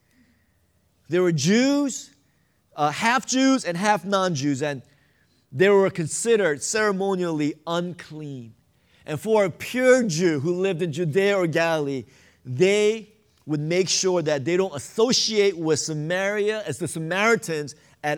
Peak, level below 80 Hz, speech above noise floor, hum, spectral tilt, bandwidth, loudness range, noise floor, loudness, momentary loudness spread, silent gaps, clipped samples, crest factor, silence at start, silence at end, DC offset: -6 dBFS; -68 dBFS; 43 dB; none; -4.5 dB/octave; 17 kHz; 2 LU; -65 dBFS; -22 LUFS; 12 LU; none; under 0.1%; 18 dB; 1.1 s; 0 s; under 0.1%